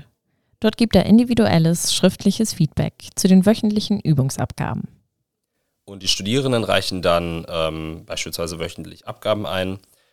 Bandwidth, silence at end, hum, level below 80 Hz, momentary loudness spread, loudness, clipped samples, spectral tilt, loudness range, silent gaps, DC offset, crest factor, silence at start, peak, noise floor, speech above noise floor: 16 kHz; 0.35 s; none; -44 dBFS; 14 LU; -19 LUFS; under 0.1%; -5 dB/octave; 6 LU; none; 0.6%; 18 dB; 0.6 s; 0 dBFS; -76 dBFS; 57 dB